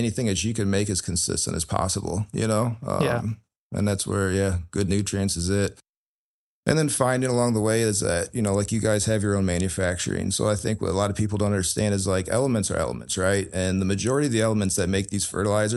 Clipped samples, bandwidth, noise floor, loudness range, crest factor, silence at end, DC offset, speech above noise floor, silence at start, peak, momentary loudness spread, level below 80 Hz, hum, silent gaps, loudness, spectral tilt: under 0.1%; 12.5 kHz; under -90 dBFS; 2 LU; 22 dB; 0 s; under 0.1%; over 66 dB; 0 s; -2 dBFS; 4 LU; -46 dBFS; none; 3.57-3.70 s, 5.89-6.63 s; -24 LUFS; -5 dB/octave